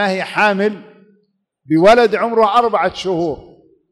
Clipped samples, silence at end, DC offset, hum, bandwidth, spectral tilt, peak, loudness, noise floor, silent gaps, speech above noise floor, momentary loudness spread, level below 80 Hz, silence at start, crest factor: under 0.1%; 0.5 s; under 0.1%; none; 12 kHz; -5.5 dB/octave; -2 dBFS; -14 LUFS; -62 dBFS; none; 48 dB; 11 LU; -48 dBFS; 0 s; 12 dB